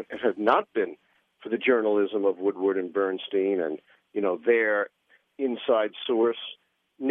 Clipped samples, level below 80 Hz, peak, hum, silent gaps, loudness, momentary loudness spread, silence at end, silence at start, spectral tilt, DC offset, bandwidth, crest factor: under 0.1%; -80 dBFS; -6 dBFS; none; none; -26 LUFS; 10 LU; 0 s; 0 s; -7.5 dB/octave; under 0.1%; 4.1 kHz; 20 dB